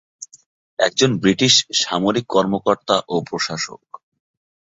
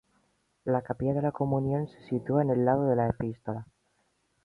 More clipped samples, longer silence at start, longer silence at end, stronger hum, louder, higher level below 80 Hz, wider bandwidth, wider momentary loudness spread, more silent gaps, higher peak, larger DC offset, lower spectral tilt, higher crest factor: neither; second, 0.2 s vs 0.65 s; first, 0.95 s vs 0.8 s; neither; first, -18 LUFS vs -29 LUFS; about the same, -58 dBFS vs -56 dBFS; first, 8 kHz vs 4.7 kHz; first, 18 LU vs 12 LU; first, 0.46-0.77 s vs none; first, -2 dBFS vs -12 dBFS; neither; second, -3.5 dB/octave vs -11 dB/octave; about the same, 20 dB vs 18 dB